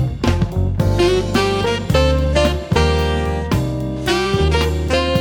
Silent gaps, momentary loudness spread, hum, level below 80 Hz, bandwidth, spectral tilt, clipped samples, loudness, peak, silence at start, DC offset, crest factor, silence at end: none; 4 LU; none; -24 dBFS; 18 kHz; -6 dB/octave; under 0.1%; -17 LUFS; -2 dBFS; 0 s; under 0.1%; 14 dB; 0 s